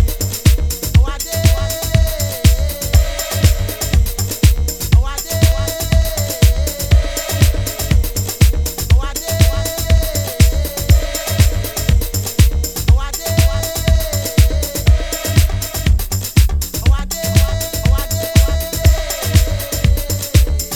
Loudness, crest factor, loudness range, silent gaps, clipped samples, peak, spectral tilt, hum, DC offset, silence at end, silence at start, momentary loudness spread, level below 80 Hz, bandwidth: -16 LUFS; 14 dB; 0 LU; none; under 0.1%; 0 dBFS; -4.5 dB/octave; none; under 0.1%; 0 s; 0 s; 4 LU; -16 dBFS; over 20 kHz